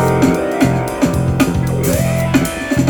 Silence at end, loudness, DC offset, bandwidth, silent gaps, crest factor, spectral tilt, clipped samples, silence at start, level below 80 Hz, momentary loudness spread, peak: 0 s; -15 LUFS; under 0.1%; 19.5 kHz; none; 14 dB; -6 dB/octave; under 0.1%; 0 s; -30 dBFS; 2 LU; 0 dBFS